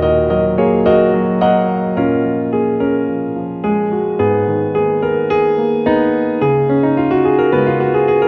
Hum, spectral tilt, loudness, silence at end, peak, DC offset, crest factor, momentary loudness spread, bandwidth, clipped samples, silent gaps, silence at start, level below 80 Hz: none; -10.5 dB/octave; -15 LUFS; 0 s; 0 dBFS; under 0.1%; 14 dB; 4 LU; 5.4 kHz; under 0.1%; none; 0 s; -38 dBFS